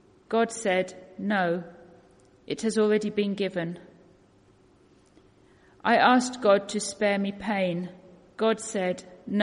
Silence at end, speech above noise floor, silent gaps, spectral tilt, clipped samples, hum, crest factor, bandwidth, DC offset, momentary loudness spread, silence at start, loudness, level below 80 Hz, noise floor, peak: 0 s; 34 dB; none; -4.5 dB/octave; under 0.1%; none; 20 dB; 10.5 kHz; under 0.1%; 14 LU; 0.3 s; -26 LUFS; -68 dBFS; -59 dBFS; -8 dBFS